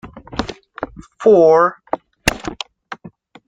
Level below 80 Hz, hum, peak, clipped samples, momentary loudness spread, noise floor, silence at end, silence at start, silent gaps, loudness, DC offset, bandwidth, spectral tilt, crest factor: -42 dBFS; none; 0 dBFS; under 0.1%; 21 LU; -42 dBFS; 0.4 s; 0.05 s; none; -16 LUFS; under 0.1%; 15.5 kHz; -4.5 dB/octave; 18 dB